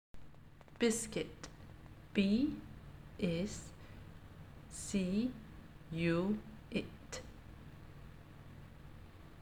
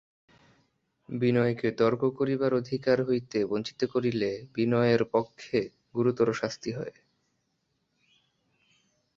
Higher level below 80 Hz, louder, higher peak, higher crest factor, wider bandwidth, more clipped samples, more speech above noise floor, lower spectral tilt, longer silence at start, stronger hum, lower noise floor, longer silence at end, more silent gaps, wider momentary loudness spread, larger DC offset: first, -58 dBFS vs -66 dBFS; second, -38 LUFS vs -28 LUFS; second, -20 dBFS vs -10 dBFS; about the same, 22 dB vs 18 dB; first, 15.5 kHz vs 7.6 kHz; neither; second, 22 dB vs 49 dB; second, -5 dB/octave vs -7 dB/octave; second, 0.15 s vs 1.1 s; neither; second, -58 dBFS vs -77 dBFS; second, 0 s vs 2.25 s; neither; first, 22 LU vs 8 LU; neither